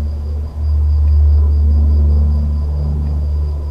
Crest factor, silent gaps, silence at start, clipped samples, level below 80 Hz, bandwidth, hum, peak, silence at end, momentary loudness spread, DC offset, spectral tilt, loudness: 6 dB; none; 0 s; under 0.1%; -14 dBFS; 5 kHz; none; -6 dBFS; 0 s; 8 LU; under 0.1%; -10.5 dB/octave; -15 LUFS